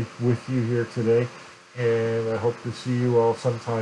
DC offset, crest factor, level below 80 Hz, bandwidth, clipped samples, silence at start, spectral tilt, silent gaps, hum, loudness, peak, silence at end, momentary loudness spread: under 0.1%; 14 dB; -66 dBFS; 10.5 kHz; under 0.1%; 0 s; -7.5 dB/octave; none; none; -24 LUFS; -10 dBFS; 0 s; 9 LU